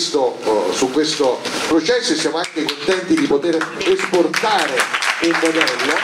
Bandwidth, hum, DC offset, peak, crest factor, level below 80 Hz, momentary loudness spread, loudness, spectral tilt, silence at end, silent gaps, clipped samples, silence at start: 15.5 kHz; none; under 0.1%; -2 dBFS; 16 dB; -58 dBFS; 4 LU; -17 LUFS; -2.5 dB/octave; 0 s; none; under 0.1%; 0 s